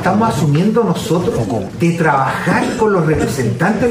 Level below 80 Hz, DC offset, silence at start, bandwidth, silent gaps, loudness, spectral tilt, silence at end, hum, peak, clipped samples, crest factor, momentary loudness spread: -38 dBFS; under 0.1%; 0 s; 16 kHz; none; -15 LUFS; -6.5 dB/octave; 0 s; none; 0 dBFS; under 0.1%; 14 dB; 4 LU